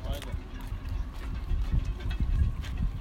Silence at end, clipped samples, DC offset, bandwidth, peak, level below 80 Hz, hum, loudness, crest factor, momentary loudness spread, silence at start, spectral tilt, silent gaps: 0 s; under 0.1%; under 0.1%; 15 kHz; -14 dBFS; -32 dBFS; none; -34 LUFS; 16 dB; 9 LU; 0 s; -6.5 dB/octave; none